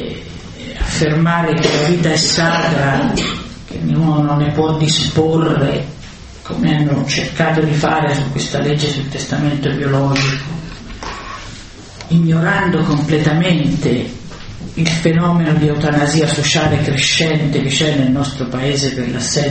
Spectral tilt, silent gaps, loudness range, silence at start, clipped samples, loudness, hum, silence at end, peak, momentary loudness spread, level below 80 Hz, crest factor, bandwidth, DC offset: -5 dB/octave; none; 3 LU; 0 s; under 0.1%; -15 LUFS; none; 0 s; 0 dBFS; 15 LU; -36 dBFS; 16 dB; 8.8 kHz; under 0.1%